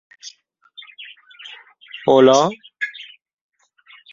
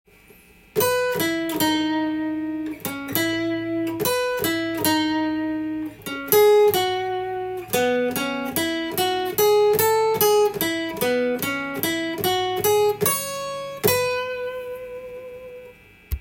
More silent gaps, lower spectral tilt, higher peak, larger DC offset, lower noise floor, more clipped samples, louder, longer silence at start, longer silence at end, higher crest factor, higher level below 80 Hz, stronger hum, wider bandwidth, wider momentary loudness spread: neither; about the same, -4.5 dB/octave vs -3.5 dB/octave; about the same, -2 dBFS vs 0 dBFS; neither; about the same, -51 dBFS vs -51 dBFS; neither; first, -16 LUFS vs -22 LUFS; second, 0.25 s vs 0.75 s; first, 1.1 s vs 0 s; about the same, 20 dB vs 22 dB; second, -66 dBFS vs -48 dBFS; neither; second, 7.6 kHz vs 17 kHz; first, 27 LU vs 13 LU